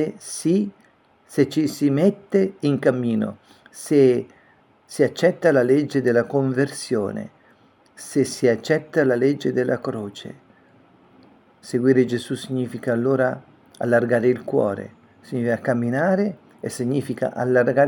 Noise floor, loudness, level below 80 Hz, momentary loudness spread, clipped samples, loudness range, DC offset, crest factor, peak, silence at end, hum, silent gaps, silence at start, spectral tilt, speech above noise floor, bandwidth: -57 dBFS; -21 LUFS; -68 dBFS; 13 LU; under 0.1%; 3 LU; under 0.1%; 18 dB; -4 dBFS; 0 s; none; none; 0 s; -6.5 dB/octave; 36 dB; 18 kHz